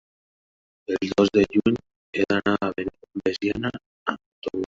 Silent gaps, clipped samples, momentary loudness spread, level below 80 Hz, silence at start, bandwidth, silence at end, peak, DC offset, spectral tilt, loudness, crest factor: 1.96-2.13 s, 3.86-4.06 s, 4.26-4.42 s; under 0.1%; 12 LU; -52 dBFS; 0.9 s; 7.6 kHz; 0 s; -6 dBFS; under 0.1%; -6 dB/octave; -25 LUFS; 20 dB